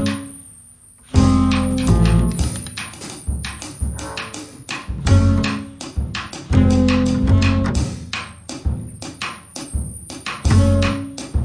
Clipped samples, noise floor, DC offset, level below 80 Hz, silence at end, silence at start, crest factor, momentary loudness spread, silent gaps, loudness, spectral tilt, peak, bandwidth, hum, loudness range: under 0.1%; -45 dBFS; under 0.1%; -26 dBFS; 0 s; 0 s; 18 dB; 14 LU; none; -20 LUFS; -6 dB/octave; 0 dBFS; 10.5 kHz; none; 5 LU